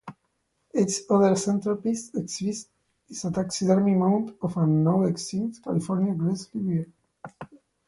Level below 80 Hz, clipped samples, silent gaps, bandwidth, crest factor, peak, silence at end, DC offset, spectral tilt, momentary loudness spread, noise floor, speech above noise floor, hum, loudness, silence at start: -62 dBFS; under 0.1%; none; 11.5 kHz; 18 dB; -8 dBFS; 0.3 s; under 0.1%; -6.5 dB/octave; 17 LU; -74 dBFS; 50 dB; none; -25 LUFS; 0.05 s